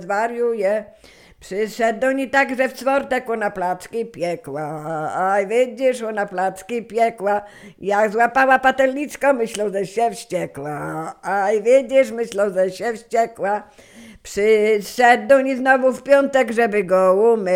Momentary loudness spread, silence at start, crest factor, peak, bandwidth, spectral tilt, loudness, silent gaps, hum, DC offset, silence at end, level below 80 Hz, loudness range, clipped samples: 12 LU; 0 s; 18 dB; 0 dBFS; 16 kHz; -4.5 dB/octave; -19 LUFS; none; none; under 0.1%; 0 s; -58 dBFS; 5 LU; under 0.1%